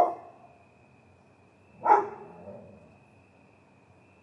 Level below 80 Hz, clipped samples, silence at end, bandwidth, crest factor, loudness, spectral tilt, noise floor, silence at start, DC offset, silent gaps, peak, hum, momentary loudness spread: -80 dBFS; under 0.1%; 1.65 s; 7 kHz; 26 dB; -26 LUFS; -7 dB/octave; -59 dBFS; 0 s; under 0.1%; none; -6 dBFS; none; 27 LU